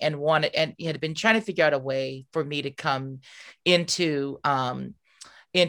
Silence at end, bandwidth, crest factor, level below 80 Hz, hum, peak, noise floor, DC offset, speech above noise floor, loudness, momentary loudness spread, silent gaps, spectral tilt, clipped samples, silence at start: 0 s; 19.5 kHz; 22 dB; -68 dBFS; none; -4 dBFS; -51 dBFS; under 0.1%; 26 dB; -25 LUFS; 10 LU; none; -4 dB/octave; under 0.1%; 0 s